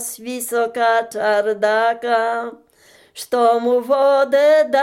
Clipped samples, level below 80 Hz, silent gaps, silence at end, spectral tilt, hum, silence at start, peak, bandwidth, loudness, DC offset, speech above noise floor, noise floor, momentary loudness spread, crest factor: under 0.1%; -72 dBFS; none; 0 s; -2.5 dB/octave; none; 0 s; -4 dBFS; 17 kHz; -17 LUFS; under 0.1%; 34 dB; -51 dBFS; 12 LU; 12 dB